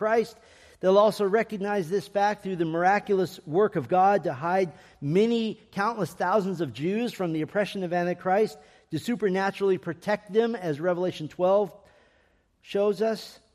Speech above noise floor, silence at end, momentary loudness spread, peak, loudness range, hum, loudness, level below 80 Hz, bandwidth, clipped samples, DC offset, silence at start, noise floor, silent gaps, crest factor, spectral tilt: 40 dB; 0.2 s; 7 LU; -8 dBFS; 3 LU; none; -26 LUFS; -68 dBFS; 14.5 kHz; under 0.1%; under 0.1%; 0 s; -65 dBFS; none; 18 dB; -6.5 dB/octave